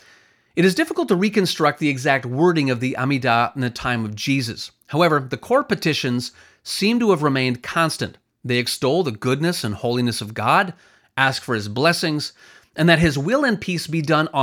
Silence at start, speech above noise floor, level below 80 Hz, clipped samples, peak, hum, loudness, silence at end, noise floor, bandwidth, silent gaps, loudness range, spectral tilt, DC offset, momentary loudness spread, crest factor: 0.55 s; 34 dB; -52 dBFS; under 0.1%; 0 dBFS; none; -20 LUFS; 0 s; -54 dBFS; 18.5 kHz; none; 2 LU; -5 dB/octave; under 0.1%; 9 LU; 20 dB